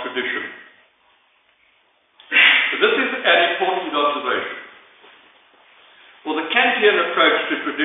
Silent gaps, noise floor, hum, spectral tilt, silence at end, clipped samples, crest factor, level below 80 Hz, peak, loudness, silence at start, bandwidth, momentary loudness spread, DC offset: none; -60 dBFS; none; -7 dB/octave; 0 s; under 0.1%; 20 dB; -74 dBFS; 0 dBFS; -17 LUFS; 0 s; 4 kHz; 14 LU; under 0.1%